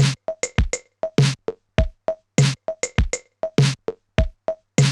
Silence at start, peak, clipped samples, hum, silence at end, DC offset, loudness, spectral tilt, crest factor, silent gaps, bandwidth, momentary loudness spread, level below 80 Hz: 0 s; 0 dBFS; under 0.1%; none; 0 s; under 0.1%; -23 LUFS; -5 dB/octave; 20 dB; none; 12 kHz; 8 LU; -30 dBFS